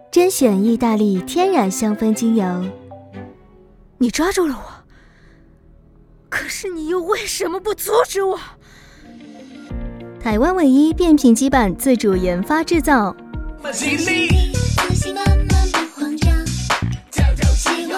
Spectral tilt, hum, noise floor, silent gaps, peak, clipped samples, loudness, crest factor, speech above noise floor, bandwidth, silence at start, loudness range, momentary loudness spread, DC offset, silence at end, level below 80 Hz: -5 dB/octave; none; -48 dBFS; none; 0 dBFS; under 0.1%; -17 LUFS; 18 dB; 31 dB; 18 kHz; 0.15 s; 9 LU; 17 LU; under 0.1%; 0 s; -26 dBFS